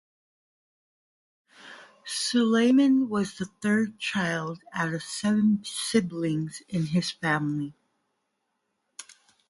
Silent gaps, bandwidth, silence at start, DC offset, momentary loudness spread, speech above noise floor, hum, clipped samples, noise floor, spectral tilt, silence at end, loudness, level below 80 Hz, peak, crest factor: none; 11.5 kHz; 1.65 s; under 0.1%; 23 LU; 53 dB; none; under 0.1%; -78 dBFS; -5 dB/octave; 0.5 s; -26 LUFS; -68 dBFS; -10 dBFS; 18 dB